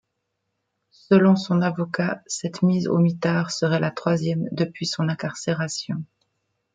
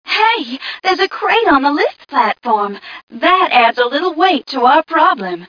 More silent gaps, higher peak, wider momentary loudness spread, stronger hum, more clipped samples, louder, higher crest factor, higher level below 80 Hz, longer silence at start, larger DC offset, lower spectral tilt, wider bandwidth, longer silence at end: second, none vs 3.03-3.07 s; second, -4 dBFS vs 0 dBFS; about the same, 10 LU vs 8 LU; neither; neither; second, -23 LUFS vs -13 LUFS; about the same, 18 dB vs 14 dB; second, -66 dBFS vs -54 dBFS; first, 1.1 s vs 0.05 s; neither; first, -6 dB/octave vs -4 dB/octave; first, 9.4 kHz vs 5.4 kHz; first, 0.7 s vs 0 s